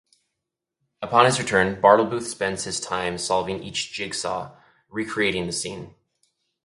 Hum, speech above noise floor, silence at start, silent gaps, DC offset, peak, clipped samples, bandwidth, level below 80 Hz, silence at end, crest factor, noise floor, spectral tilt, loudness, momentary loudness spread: none; 61 dB; 1 s; none; under 0.1%; 0 dBFS; under 0.1%; 11.5 kHz; -56 dBFS; 0.75 s; 24 dB; -83 dBFS; -3.5 dB/octave; -23 LUFS; 15 LU